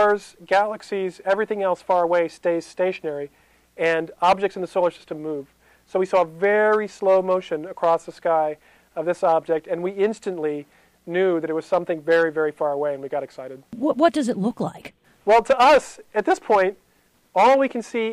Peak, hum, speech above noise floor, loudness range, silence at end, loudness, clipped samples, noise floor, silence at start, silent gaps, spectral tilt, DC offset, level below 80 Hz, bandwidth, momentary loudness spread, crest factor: -4 dBFS; none; 40 dB; 4 LU; 0 s; -22 LUFS; under 0.1%; -61 dBFS; 0 s; none; -5 dB/octave; under 0.1%; -60 dBFS; 12.5 kHz; 12 LU; 18 dB